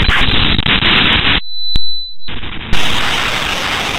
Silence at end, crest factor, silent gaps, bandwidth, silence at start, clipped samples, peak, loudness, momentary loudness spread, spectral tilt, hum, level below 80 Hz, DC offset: 0 s; 12 dB; none; 16 kHz; 0 s; under 0.1%; 0 dBFS; -13 LUFS; 14 LU; -3.5 dB/octave; none; -22 dBFS; under 0.1%